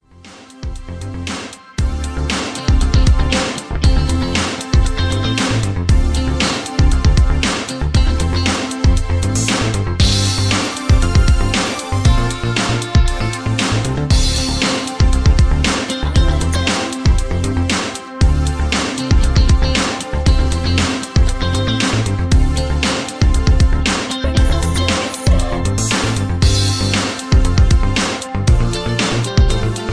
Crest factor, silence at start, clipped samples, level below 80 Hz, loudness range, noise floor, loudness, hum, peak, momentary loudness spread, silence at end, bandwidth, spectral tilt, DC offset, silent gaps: 14 dB; 0.25 s; under 0.1%; -18 dBFS; 1 LU; -40 dBFS; -16 LUFS; none; 0 dBFS; 5 LU; 0 s; 11 kHz; -4.5 dB/octave; under 0.1%; none